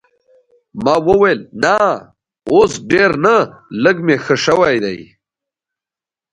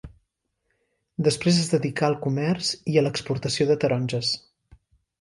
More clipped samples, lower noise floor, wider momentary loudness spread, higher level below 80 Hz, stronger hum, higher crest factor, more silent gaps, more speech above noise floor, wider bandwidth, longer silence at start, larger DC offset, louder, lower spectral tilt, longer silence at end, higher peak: neither; first, -89 dBFS vs -76 dBFS; first, 11 LU vs 6 LU; first, -48 dBFS vs -56 dBFS; neither; about the same, 16 dB vs 20 dB; neither; first, 76 dB vs 53 dB; about the same, 10.5 kHz vs 11.5 kHz; first, 0.75 s vs 0.05 s; neither; first, -14 LUFS vs -24 LUFS; about the same, -5 dB/octave vs -5 dB/octave; first, 1.3 s vs 0.8 s; first, 0 dBFS vs -6 dBFS